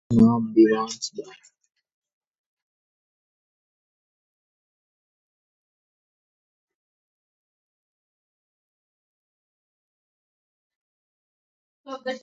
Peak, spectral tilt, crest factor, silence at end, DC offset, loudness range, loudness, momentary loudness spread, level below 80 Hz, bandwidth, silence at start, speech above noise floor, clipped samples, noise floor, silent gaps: -6 dBFS; -6.5 dB/octave; 24 dB; 0.05 s; under 0.1%; 22 LU; -20 LUFS; 19 LU; -58 dBFS; 7.8 kHz; 0.1 s; over 69 dB; under 0.1%; under -90 dBFS; 1.92-2.02 s, 2.13-2.21 s, 2.27-6.68 s, 6.75-11.84 s